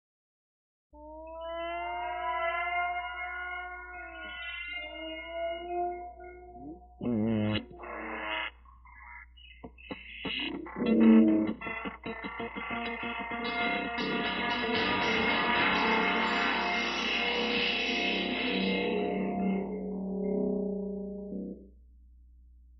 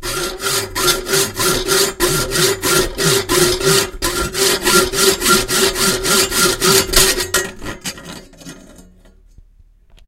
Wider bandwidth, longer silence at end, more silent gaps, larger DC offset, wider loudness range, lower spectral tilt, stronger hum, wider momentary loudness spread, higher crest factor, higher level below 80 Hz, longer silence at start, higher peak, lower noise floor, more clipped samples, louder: second, 6 kHz vs 17 kHz; second, 0.05 s vs 1.25 s; neither; neither; first, 9 LU vs 4 LU; about the same, -2.5 dB/octave vs -2 dB/octave; neither; first, 17 LU vs 10 LU; first, 22 dB vs 16 dB; second, -56 dBFS vs -32 dBFS; first, 0.95 s vs 0 s; second, -10 dBFS vs 0 dBFS; first, -56 dBFS vs -48 dBFS; neither; second, -30 LUFS vs -14 LUFS